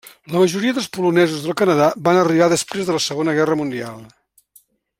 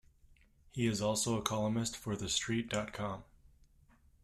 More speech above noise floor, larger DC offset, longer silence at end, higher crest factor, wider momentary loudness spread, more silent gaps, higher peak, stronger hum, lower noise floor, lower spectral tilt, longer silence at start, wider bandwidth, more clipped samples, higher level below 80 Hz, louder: first, 37 dB vs 30 dB; neither; about the same, 0.95 s vs 1 s; second, 18 dB vs 24 dB; about the same, 7 LU vs 9 LU; neither; first, -2 dBFS vs -14 dBFS; neither; second, -55 dBFS vs -66 dBFS; about the same, -5 dB/octave vs -4 dB/octave; second, 0.3 s vs 0.75 s; first, 16.5 kHz vs 14 kHz; neither; about the same, -60 dBFS vs -60 dBFS; first, -17 LUFS vs -35 LUFS